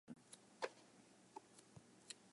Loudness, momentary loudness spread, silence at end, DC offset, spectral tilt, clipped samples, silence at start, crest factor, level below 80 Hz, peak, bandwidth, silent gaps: -57 LUFS; 15 LU; 0 s; under 0.1%; -3 dB/octave; under 0.1%; 0.05 s; 28 dB; under -90 dBFS; -30 dBFS; 11.5 kHz; none